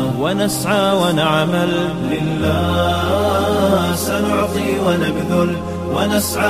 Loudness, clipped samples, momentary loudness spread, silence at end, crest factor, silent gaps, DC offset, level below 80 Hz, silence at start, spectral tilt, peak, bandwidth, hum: -17 LUFS; under 0.1%; 4 LU; 0 s; 14 dB; none; 0.3%; -38 dBFS; 0 s; -5 dB/octave; -2 dBFS; 16 kHz; none